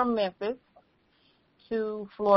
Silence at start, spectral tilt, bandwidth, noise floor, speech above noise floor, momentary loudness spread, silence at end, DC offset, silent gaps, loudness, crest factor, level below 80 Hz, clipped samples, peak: 0 s; -4 dB/octave; 5.8 kHz; -67 dBFS; 40 dB; 7 LU; 0 s; under 0.1%; none; -32 LUFS; 22 dB; -66 dBFS; under 0.1%; -8 dBFS